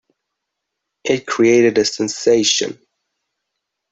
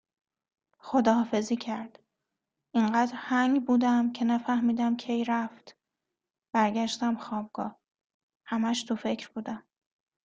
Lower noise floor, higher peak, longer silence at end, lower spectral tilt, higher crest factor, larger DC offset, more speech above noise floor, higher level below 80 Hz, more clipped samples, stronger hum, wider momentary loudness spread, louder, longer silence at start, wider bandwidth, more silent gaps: second, -78 dBFS vs -87 dBFS; first, -2 dBFS vs -8 dBFS; first, 1.2 s vs 0.7 s; second, -3 dB/octave vs -5 dB/octave; about the same, 16 dB vs 20 dB; neither; first, 63 dB vs 59 dB; first, -60 dBFS vs -72 dBFS; neither; neither; second, 9 LU vs 13 LU; first, -15 LUFS vs -28 LUFS; first, 1.05 s vs 0.85 s; about the same, 8.2 kHz vs 8.4 kHz; second, none vs 8.04-8.29 s, 8.36-8.40 s